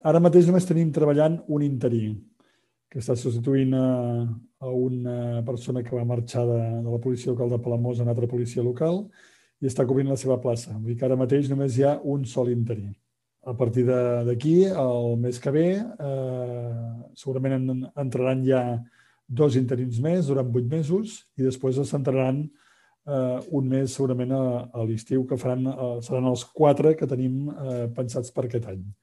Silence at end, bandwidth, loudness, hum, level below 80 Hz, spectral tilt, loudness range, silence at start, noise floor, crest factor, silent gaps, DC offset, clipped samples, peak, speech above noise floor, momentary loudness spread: 0.1 s; 12 kHz; -25 LUFS; none; -66 dBFS; -8 dB/octave; 3 LU; 0.05 s; -68 dBFS; 20 dB; none; under 0.1%; under 0.1%; -6 dBFS; 44 dB; 10 LU